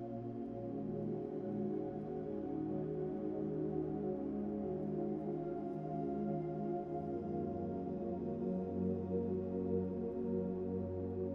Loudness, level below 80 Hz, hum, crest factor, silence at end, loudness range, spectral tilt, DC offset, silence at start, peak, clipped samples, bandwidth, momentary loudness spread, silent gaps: -40 LUFS; -66 dBFS; none; 14 dB; 0 s; 1 LU; -11.5 dB/octave; under 0.1%; 0 s; -26 dBFS; under 0.1%; 5.2 kHz; 4 LU; none